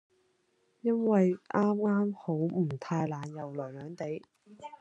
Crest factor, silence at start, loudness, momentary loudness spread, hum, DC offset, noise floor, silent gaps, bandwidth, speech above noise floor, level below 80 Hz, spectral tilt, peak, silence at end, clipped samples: 18 dB; 0.85 s; -31 LUFS; 13 LU; none; under 0.1%; -73 dBFS; none; 8 kHz; 42 dB; -80 dBFS; -9 dB/octave; -14 dBFS; 0.05 s; under 0.1%